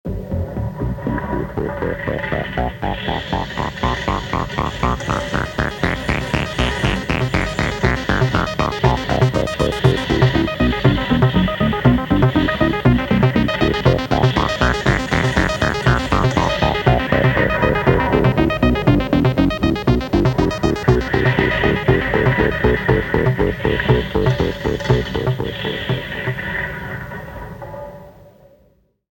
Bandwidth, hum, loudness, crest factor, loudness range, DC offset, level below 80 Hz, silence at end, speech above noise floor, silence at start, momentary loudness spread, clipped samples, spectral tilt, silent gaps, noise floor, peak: 17 kHz; none; -18 LUFS; 16 dB; 6 LU; under 0.1%; -28 dBFS; 1 s; 35 dB; 0.05 s; 8 LU; under 0.1%; -6.5 dB/octave; none; -57 dBFS; 0 dBFS